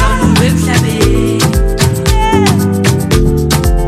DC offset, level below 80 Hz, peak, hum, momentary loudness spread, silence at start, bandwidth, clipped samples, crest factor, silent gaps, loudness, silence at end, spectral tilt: under 0.1%; -16 dBFS; 0 dBFS; none; 2 LU; 0 s; 16 kHz; under 0.1%; 10 dB; none; -11 LUFS; 0 s; -5.5 dB/octave